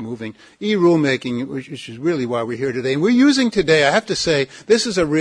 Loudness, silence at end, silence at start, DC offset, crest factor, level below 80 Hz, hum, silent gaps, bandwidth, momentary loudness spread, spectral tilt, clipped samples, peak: -18 LUFS; 0 s; 0 s; under 0.1%; 14 dB; -52 dBFS; none; none; 10.5 kHz; 14 LU; -5 dB/octave; under 0.1%; -4 dBFS